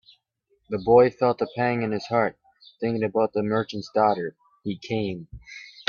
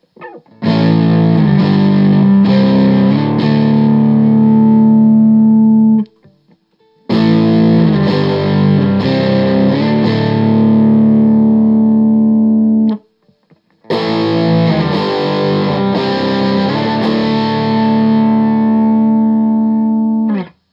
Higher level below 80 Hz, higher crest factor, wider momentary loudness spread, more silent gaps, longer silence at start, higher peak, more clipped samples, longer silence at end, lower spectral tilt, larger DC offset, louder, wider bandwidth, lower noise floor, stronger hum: second, -58 dBFS vs -52 dBFS; first, 20 dB vs 10 dB; first, 17 LU vs 6 LU; neither; first, 0.7 s vs 0.2 s; second, -4 dBFS vs 0 dBFS; neither; second, 0.1 s vs 0.25 s; second, -7 dB/octave vs -9.5 dB/octave; neither; second, -24 LUFS vs -11 LUFS; first, 7 kHz vs 5.8 kHz; first, -70 dBFS vs -54 dBFS; neither